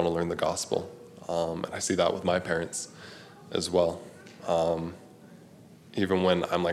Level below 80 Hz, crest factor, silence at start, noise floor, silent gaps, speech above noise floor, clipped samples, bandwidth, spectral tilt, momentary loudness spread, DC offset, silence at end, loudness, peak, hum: -60 dBFS; 20 dB; 0 s; -52 dBFS; none; 24 dB; under 0.1%; 14.5 kHz; -4.5 dB/octave; 18 LU; under 0.1%; 0 s; -29 LUFS; -10 dBFS; none